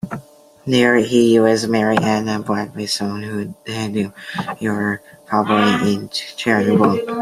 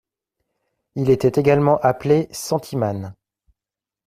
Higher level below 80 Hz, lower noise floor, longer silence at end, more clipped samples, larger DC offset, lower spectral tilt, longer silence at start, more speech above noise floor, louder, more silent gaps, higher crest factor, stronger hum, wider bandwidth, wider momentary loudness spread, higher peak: about the same, -58 dBFS vs -54 dBFS; second, -42 dBFS vs -89 dBFS; second, 0 s vs 0.95 s; neither; neither; second, -5.5 dB/octave vs -7 dB/octave; second, 0.05 s vs 0.95 s; second, 25 dB vs 71 dB; about the same, -18 LUFS vs -19 LUFS; neither; about the same, 16 dB vs 18 dB; neither; about the same, 15 kHz vs 15.5 kHz; about the same, 13 LU vs 13 LU; about the same, -2 dBFS vs -2 dBFS